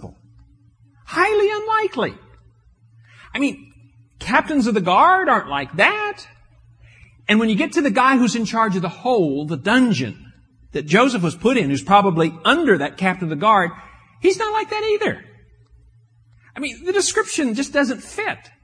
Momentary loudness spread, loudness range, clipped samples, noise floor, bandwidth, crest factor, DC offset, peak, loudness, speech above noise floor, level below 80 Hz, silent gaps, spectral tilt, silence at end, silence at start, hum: 11 LU; 5 LU; under 0.1%; -53 dBFS; 10.5 kHz; 20 dB; under 0.1%; 0 dBFS; -18 LUFS; 35 dB; -52 dBFS; none; -4.5 dB/octave; 0.25 s; 0 s; none